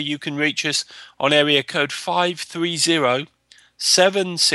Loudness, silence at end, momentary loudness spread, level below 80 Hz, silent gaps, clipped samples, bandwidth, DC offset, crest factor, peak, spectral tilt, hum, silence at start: -19 LUFS; 0 s; 10 LU; -70 dBFS; none; under 0.1%; 13 kHz; under 0.1%; 18 dB; -2 dBFS; -2.5 dB/octave; none; 0 s